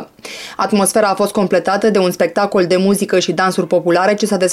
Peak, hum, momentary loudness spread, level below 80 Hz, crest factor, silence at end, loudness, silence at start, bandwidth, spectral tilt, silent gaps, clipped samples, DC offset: -4 dBFS; none; 4 LU; -58 dBFS; 10 dB; 0 s; -14 LUFS; 0 s; 15.5 kHz; -4.5 dB/octave; none; under 0.1%; under 0.1%